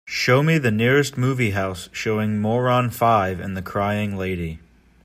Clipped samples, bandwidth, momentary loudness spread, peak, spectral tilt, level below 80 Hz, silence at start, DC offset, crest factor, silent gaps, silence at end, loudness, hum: under 0.1%; 15.5 kHz; 10 LU; -4 dBFS; -6 dB/octave; -52 dBFS; 0.05 s; under 0.1%; 16 dB; none; 0.45 s; -21 LUFS; none